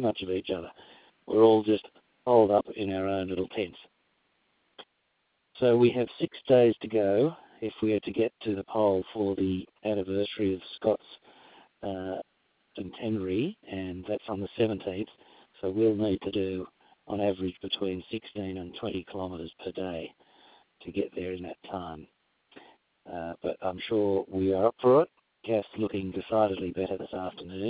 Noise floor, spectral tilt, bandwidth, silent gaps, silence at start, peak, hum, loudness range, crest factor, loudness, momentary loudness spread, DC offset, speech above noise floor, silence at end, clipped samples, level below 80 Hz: -75 dBFS; -10.5 dB/octave; 4 kHz; none; 0 s; -8 dBFS; none; 11 LU; 22 dB; -29 LUFS; 16 LU; under 0.1%; 46 dB; 0 s; under 0.1%; -58 dBFS